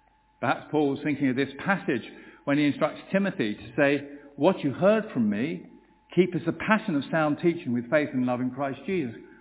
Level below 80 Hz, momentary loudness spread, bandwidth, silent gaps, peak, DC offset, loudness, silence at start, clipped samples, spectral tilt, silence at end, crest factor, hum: -64 dBFS; 7 LU; 4 kHz; none; -4 dBFS; under 0.1%; -27 LUFS; 0.4 s; under 0.1%; -10.5 dB/octave; 0.15 s; 22 dB; none